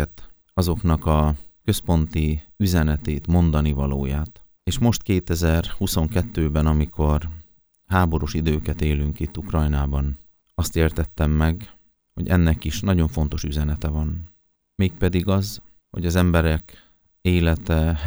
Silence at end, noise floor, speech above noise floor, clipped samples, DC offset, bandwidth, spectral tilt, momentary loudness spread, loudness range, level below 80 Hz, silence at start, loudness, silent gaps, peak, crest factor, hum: 0 s; -53 dBFS; 33 dB; under 0.1%; under 0.1%; over 20 kHz; -6.5 dB/octave; 9 LU; 2 LU; -28 dBFS; 0 s; -22 LUFS; none; -2 dBFS; 20 dB; none